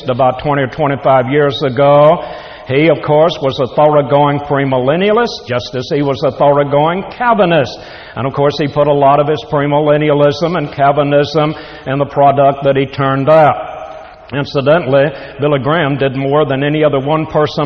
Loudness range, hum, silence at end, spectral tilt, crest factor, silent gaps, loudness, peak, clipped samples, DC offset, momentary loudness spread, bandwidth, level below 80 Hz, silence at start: 2 LU; none; 0 s; -7.5 dB/octave; 12 dB; none; -12 LUFS; 0 dBFS; under 0.1%; under 0.1%; 9 LU; 6.6 kHz; -44 dBFS; 0 s